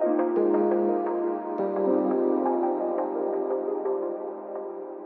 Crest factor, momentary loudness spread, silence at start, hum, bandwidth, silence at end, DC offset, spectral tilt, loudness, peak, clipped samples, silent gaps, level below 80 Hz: 14 dB; 11 LU; 0 s; none; 2.9 kHz; 0 s; under 0.1%; -8.5 dB/octave; -27 LUFS; -12 dBFS; under 0.1%; none; under -90 dBFS